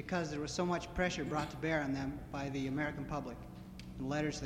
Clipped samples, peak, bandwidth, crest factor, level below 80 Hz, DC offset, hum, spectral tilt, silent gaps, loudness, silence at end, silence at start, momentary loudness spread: under 0.1%; -20 dBFS; 16 kHz; 18 dB; -54 dBFS; under 0.1%; none; -5.5 dB/octave; none; -38 LUFS; 0 s; 0 s; 12 LU